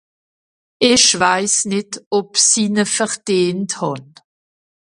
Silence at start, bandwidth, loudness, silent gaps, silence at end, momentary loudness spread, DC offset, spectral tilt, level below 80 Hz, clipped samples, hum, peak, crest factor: 0.8 s; 11.5 kHz; -15 LUFS; 2.06-2.11 s; 0.9 s; 11 LU; under 0.1%; -2 dB/octave; -58 dBFS; under 0.1%; none; 0 dBFS; 18 dB